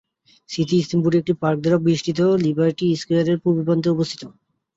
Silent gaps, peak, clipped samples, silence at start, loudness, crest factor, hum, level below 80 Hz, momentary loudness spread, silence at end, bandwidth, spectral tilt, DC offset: none; -6 dBFS; under 0.1%; 0.5 s; -20 LUFS; 14 dB; none; -58 dBFS; 5 LU; 0.45 s; 8 kHz; -7 dB/octave; under 0.1%